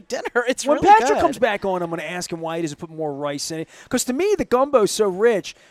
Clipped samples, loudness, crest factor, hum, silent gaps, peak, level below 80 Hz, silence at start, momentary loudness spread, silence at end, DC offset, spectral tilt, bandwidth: under 0.1%; -20 LUFS; 18 dB; none; none; -2 dBFS; -52 dBFS; 0.1 s; 13 LU; 0.2 s; under 0.1%; -4 dB/octave; 15.5 kHz